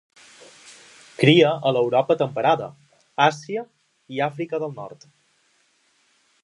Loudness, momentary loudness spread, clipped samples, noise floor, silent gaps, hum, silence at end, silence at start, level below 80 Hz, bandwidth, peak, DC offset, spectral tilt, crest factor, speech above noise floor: -21 LUFS; 20 LU; under 0.1%; -64 dBFS; none; none; 1.55 s; 1.2 s; -74 dBFS; 11 kHz; 0 dBFS; under 0.1%; -6 dB/octave; 22 dB; 43 dB